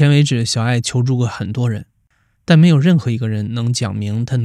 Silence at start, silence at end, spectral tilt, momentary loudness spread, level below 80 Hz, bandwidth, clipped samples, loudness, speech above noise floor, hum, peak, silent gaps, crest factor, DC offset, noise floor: 0 s; 0 s; -6 dB/octave; 10 LU; -52 dBFS; 11.5 kHz; under 0.1%; -16 LUFS; 46 dB; none; 0 dBFS; none; 14 dB; under 0.1%; -61 dBFS